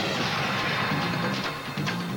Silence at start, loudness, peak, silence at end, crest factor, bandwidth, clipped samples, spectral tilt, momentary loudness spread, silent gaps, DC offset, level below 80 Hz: 0 s; -27 LUFS; -14 dBFS; 0 s; 14 dB; over 20 kHz; under 0.1%; -4.5 dB/octave; 4 LU; none; under 0.1%; -56 dBFS